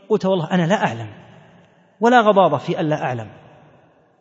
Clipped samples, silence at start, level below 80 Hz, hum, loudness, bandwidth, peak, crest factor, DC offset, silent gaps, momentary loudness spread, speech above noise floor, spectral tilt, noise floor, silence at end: under 0.1%; 0.1 s; -66 dBFS; none; -18 LUFS; 8 kHz; 0 dBFS; 18 dB; under 0.1%; none; 18 LU; 36 dB; -6.5 dB/octave; -53 dBFS; 0.9 s